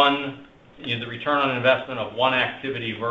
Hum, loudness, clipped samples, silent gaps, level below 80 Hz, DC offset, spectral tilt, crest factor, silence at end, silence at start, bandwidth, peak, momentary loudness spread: none; -23 LUFS; under 0.1%; none; -60 dBFS; under 0.1%; -6.5 dB/octave; 20 dB; 0 s; 0 s; 7.8 kHz; -4 dBFS; 12 LU